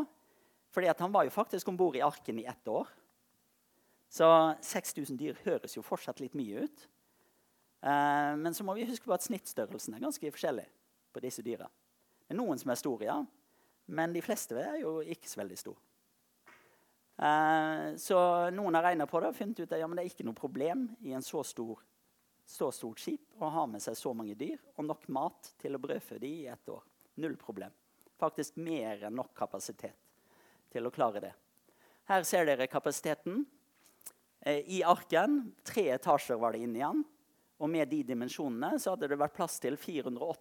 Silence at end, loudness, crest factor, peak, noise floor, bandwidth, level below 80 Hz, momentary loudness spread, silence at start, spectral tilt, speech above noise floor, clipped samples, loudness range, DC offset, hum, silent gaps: 0.05 s; -34 LUFS; 24 dB; -12 dBFS; -74 dBFS; 19 kHz; -84 dBFS; 15 LU; 0 s; -4.5 dB/octave; 40 dB; under 0.1%; 9 LU; under 0.1%; none; none